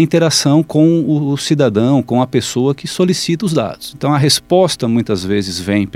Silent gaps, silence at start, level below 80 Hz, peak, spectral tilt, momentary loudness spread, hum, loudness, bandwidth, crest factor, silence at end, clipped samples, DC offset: none; 0 s; -48 dBFS; 0 dBFS; -5.5 dB/octave; 6 LU; none; -14 LUFS; 16 kHz; 14 dB; 0.05 s; under 0.1%; under 0.1%